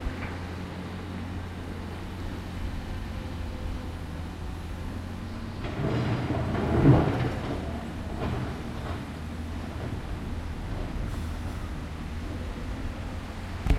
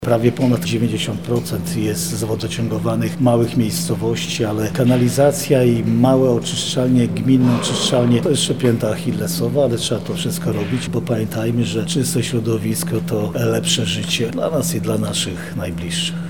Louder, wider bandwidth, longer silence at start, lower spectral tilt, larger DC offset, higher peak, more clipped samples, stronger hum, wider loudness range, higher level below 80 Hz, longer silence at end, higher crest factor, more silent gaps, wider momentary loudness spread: second, -32 LUFS vs -18 LUFS; second, 14.5 kHz vs 19 kHz; about the same, 0 s vs 0 s; first, -7.5 dB/octave vs -5.5 dB/octave; second, under 0.1% vs 0.8%; second, -8 dBFS vs -2 dBFS; neither; neither; first, 9 LU vs 4 LU; first, -38 dBFS vs -48 dBFS; about the same, 0 s vs 0 s; first, 24 dB vs 16 dB; neither; first, 9 LU vs 6 LU